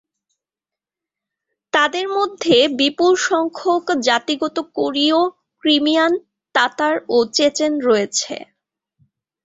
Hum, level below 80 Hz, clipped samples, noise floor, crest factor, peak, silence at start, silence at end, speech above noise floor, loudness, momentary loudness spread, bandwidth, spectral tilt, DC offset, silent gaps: none; -64 dBFS; under 0.1%; -88 dBFS; 18 dB; 0 dBFS; 1.75 s; 1 s; 71 dB; -17 LUFS; 7 LU; 8 kHz; -2.5 dB/octave; under 0.1%; none